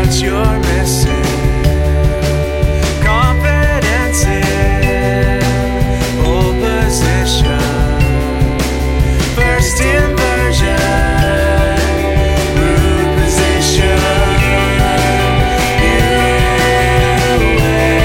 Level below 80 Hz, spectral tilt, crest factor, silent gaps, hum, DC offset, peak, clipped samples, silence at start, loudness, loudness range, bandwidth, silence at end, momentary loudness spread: -16 dBFS; -5 dB/octave; 12 dB; none; none; 0.3%; 0 dBFS; under 0.1%; 0 s; -12 LUFS; 2 LU; 16.5 kHz; 0 s; 3 LU